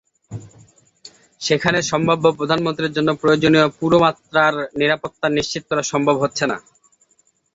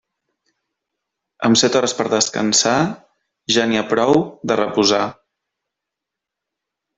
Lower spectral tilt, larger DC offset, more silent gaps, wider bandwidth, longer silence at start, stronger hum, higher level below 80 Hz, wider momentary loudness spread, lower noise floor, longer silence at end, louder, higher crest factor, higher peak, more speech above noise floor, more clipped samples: first, -4.5 dB/octave vs -3 dB/octave; neither; neither; about the same, 8 kHz vs 8.4 kHz; second, 0.3 s vs 1.4 s; neither; first, -54 dBFS vs -60 dBFS; about the same, 9 LU vs 8 LU; second, -62 dBFS vs -83 dBFS; second, 0.95 s vs 1.85 s; about the same, -18 LUFS vs -17 LUFS; about the same, 18 dB vs 18 dB; about the same, -2 dBFS vs -2 dBFS; second, 44 dB vs 67 dB; neither